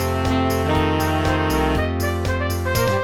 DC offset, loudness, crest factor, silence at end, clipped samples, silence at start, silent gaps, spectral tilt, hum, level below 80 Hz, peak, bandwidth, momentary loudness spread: 0.9%; -20 LUFS; 12 dB; 0 s; under 0.1%; 0 s; none; -5.5 dB/octave; none; -32 dBFS; -6 dBFS; 19 kHz; 3 LU